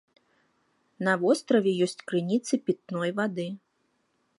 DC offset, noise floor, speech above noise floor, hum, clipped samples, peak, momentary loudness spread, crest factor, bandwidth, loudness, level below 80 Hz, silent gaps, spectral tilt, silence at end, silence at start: under 0.1%; -73 dBFS; 46 dB; none; under 0.1%; -10 dBFS; 9 LU; 20 dB; 11.5 kHz; -27 LUFS; -80 dBFS; none; -5.5 dB/octave; 0.8 s; 1 s